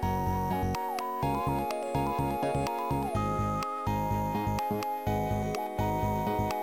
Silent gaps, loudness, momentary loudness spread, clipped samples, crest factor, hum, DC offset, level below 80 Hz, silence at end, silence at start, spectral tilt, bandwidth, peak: none; -31 LUFS; 2 LU; under 0.1%; 14 dB; none; under 0.1%; -44 dBFS; 0 s; 0 s; -6.5 dB/octave; 17 kHz; -16 dBFS